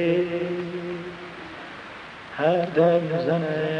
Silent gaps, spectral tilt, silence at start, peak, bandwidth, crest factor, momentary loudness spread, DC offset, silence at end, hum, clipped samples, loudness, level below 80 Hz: none; -8 dB/octave; 0 s; -8 dBFS; 9.2 kHz; 18 dB; 18 LU; under 0.1%; 0 s; none; under 0.1%; -24 LUFS; -62 dBFS